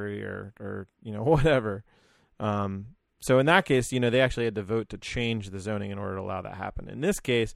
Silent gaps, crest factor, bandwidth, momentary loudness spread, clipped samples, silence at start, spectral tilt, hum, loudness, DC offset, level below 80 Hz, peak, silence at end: none; 22 dB; 15 kHz; 16 LU; under 0.1%; 0 s; -5.5 dB/octave; none; -27 LUFS; under 0.1%; -44 dBFS; -6 dBFS; 0 s